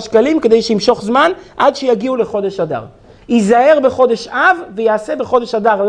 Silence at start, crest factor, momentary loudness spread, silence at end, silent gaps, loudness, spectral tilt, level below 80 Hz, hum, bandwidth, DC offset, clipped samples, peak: 0 s; 12 dB; 7 LU; 0 s; none; -13 LUFS; -5 dB/octave; -50 dBFS; none; 10 kHz; under 0.1%; under 0.1%; 0 dBFS